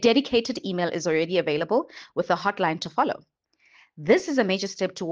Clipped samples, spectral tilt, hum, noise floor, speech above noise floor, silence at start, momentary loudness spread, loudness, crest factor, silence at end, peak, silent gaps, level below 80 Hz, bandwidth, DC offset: under 0.1%; -4.5 dB/octave; none; -59 dBFS; 35 dB; 0 s; 8 LU; -25 LUFS; 18 dB; 0 s; -6 dBFS; none; -64 dBFS; 9.4 kHz; under 0.1%